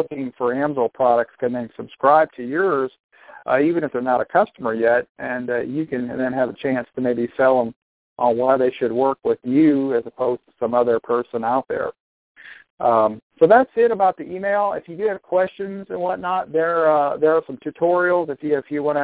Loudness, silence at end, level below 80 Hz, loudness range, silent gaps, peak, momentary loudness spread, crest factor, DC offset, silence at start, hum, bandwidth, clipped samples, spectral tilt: -20 LUFS; 0 s; -62 dBFS; 3 LU; 3.00-3.09 s, 5.09-5.15 s, 7.76-8.16 s, 12.00-12.35 s, 12.70-12.78 s, 13.22-13.30 s; -2 dBFS; 9 LU; 18 dB; under 0.1%; 0 s; none; 4 kHz; under 0.1%; -10.5 dB/octave